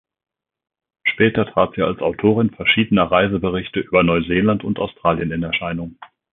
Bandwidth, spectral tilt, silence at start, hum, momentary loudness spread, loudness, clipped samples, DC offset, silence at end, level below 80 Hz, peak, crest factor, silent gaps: 4 kHz; -11 dB/octave; 1.05 s; none; 7 LU; -18 LUFS; under 0.1%; under 0.1%; 0.3 s; -44 dBFS; -2 dBFS; 18 dB; none